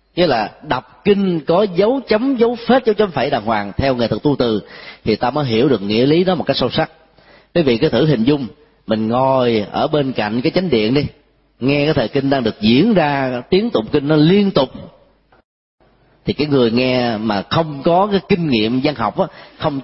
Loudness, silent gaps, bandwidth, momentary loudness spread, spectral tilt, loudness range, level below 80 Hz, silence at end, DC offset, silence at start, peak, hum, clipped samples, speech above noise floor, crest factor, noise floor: -16 LUFS; 15.45-15.78 s; 5.8 kHz; 8 LU; -10.5 dB/octave; 2 LU; -44 dBFS; 0 s; under 0.1%; 0.15 s; 0 dBFS; none; under 0.1%; 33 dB; 16 dB; -48 dBFS